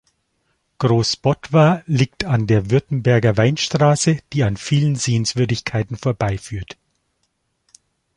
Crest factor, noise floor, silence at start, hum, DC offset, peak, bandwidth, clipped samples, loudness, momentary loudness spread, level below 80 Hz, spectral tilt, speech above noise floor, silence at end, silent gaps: 18 dB; -70 dBFS; 0.8 s; none; under 0.1%; 0 dBFS; 11 kHz; under 0.1%; -18 LUFS; 8 LU; -44 dBFS; -5.5 dB/octave; 52 dB; 1.45 s; none